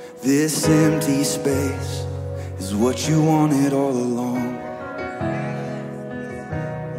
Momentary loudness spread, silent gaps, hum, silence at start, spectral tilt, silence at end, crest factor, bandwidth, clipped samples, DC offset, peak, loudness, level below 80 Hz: 13 LU; none; none; 0 s; -5.5 dB/octave; 0 s; 18 dB; 16 kHz; under 0.1%; under 0.1%; -4 dBFS; -22 LUFS; -50 dBFS